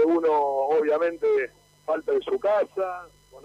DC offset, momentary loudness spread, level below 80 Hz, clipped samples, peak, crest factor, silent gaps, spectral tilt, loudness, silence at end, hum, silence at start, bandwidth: under 0.1%; 10 LU; -64 dBFS; under 0.1%; -12 dBFS; 12 dB; none; -5.5 dB/octave; -24 LUFS; 0.05 s; 50 Hz at -65 dBFS; 0 s; 9.6 kHz